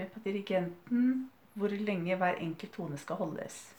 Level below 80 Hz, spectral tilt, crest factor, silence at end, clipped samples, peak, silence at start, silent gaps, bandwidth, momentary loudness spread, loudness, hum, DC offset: -80 dBFS; -6.5 dB/octave; 16 dB; 0.05 s; under 0.1%; -18 dBFS; 0 s; none; 20 kHz; 10 LU; -34 LUFS; none; under 0.1%